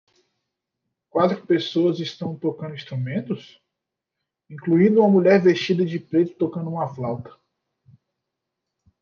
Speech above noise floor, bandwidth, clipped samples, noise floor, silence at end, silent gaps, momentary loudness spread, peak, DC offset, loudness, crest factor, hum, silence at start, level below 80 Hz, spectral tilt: 63 dB; 6.8 kHz; under 0.1%; -84 dBFS; 1.7 s; none; 15 LU; -4 dBFS; under 0.1%; -21 LUFS; 18 dB; none; 1.15 s; -68 dBFS; -7.5 dB/octave